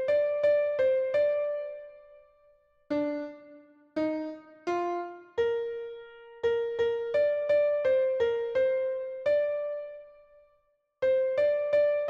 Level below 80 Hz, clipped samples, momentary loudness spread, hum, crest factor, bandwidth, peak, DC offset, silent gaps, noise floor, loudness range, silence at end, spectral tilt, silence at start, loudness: -68 dBFS; under 0.1%; 14 LU; none; 12 dB; 6.8 kHz; -16 dBFS; under 0.1%; none; -71 dBFS; 7 LU; 0 s; -6 dB/octave; 0 s; -29 LUFS